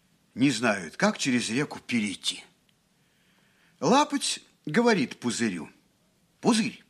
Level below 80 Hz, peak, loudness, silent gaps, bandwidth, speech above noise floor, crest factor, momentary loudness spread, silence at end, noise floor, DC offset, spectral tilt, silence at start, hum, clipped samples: -72 dBFS; -6 dBFS; -26 LUFS; none; 13.5 kHz; 41 dB; 22 dB; 9 LU; 0.15 s; -67 dBFS; under 0.1%; -4 dB/octave; 0.35 s; none; under 0.1%